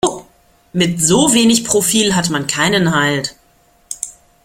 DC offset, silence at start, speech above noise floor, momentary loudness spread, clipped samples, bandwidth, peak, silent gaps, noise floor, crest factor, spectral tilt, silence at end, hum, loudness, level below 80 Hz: under 0.1%; 0.05 s; 39 dB; 15 LU; under 0.1%; 16.5 kHz; 0 dBFS; none; -53 dBFS; 16 dB; -3.5 dB/octave; 0.35 s; none; -13 LUFS; -48 dBFS